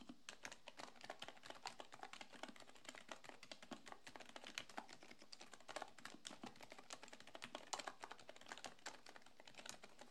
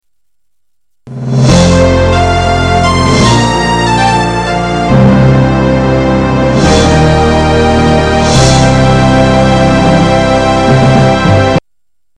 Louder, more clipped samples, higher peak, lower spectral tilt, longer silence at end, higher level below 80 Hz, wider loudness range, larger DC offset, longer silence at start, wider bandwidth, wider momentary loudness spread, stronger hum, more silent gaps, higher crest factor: second, -56 LUFS vs -8 LUFS; neither; second, -24 dBFS vs 0 dBFS; second, -1.5 dB/octave vs -6 dB/octave; second, 0 s vs 0.6 s; second, -86 dBFS vs -20 dBFS; about the same, 2 LU vs 2 LU; neither; second, 0 s vs 1.05 s; first, 13 kHz vs 11 kHz; first, 7 LU vs 4 LU; neither; neither; first, 34 dB vs 8 dB